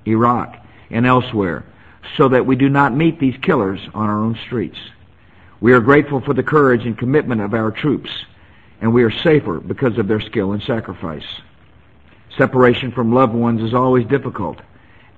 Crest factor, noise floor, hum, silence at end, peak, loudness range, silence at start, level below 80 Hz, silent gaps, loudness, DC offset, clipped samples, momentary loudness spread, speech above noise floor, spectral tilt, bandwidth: 16 dB; -48 dBFS; none; 0.65 s; 0 dBFS; 3 LU; 0.05 s; -46 dBFS; none; -16 LUFS; 0.3%; under 0.1%; 14 LU; 33 dB; -9 dB/octave; 7.8 kHz